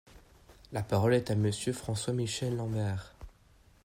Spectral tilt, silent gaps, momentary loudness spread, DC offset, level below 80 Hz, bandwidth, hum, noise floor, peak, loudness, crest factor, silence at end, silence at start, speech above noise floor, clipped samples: -5.5 dB/octave; none; 12 LU; under 0.1%; -56 dBFS; 16 kHz; none; -62 dBFS; -16 dBFS; -32 LUFS; 18 dB; 0.55 s; 0.15 s; 31 dB; under 0.1%